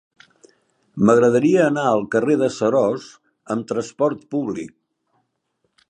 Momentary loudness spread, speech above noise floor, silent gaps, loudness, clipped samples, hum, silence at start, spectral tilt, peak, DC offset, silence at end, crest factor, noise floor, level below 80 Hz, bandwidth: 14 LU; 53 dB; none; -19 LUFS; under 0.1%; none; 0.95 s; -6.5 dB/octave; -2 dBFS; under 0.1%; 1.2 s; 20 dB; -72 dBFS; -62 dBFS; 10.5 kHz